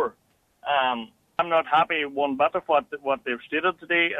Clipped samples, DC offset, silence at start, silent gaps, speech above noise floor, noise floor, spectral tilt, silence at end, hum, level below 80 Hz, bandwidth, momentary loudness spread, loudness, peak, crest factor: under 0.1%; under 0.1%; 0 s; none; 41 dB; -66 dBFS; -5.5 dB/octave; 0 s; none; -66 dBFS; 9.2 kHz; 8 LU; -24 LUFS; -8 dBFS; 18 dB